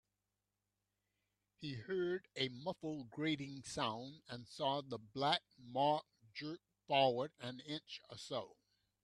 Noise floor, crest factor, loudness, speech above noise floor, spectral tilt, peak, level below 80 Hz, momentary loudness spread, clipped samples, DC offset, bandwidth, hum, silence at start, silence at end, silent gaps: -90 dBFS; 24 dB; -41 LUFS; 49 dB; -5 dB/octave; -20 dBFS; -78 dBFS; 14 LU; under 0.1%; under 0.1%; 12.5 kHz; 50 Hz at -80 dBFS; 1.6 s; 0.5 s; none